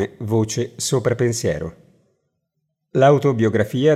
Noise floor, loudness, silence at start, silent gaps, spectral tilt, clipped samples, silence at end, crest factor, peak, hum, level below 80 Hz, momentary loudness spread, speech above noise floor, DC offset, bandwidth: -75 dBFS; -19 LUFS; 0 s; none; -5.5 dB/octave; under 0.1%; 0 s; 16 dB; -2 dBFS; none; -54 dBFS; 10 LU; 57 dB; under 0.1%; 15.5 kHz